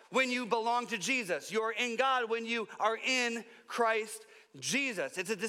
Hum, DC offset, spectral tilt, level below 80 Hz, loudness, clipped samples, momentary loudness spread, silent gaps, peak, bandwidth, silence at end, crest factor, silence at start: none; under 0.1%; -2 dB/octave; under -90 dBFS; -32 LUFS; under 0.1%; 7 LU; none; -14 dBFS; 16.5 kHz; 0 s; 20 dB; 0.1 s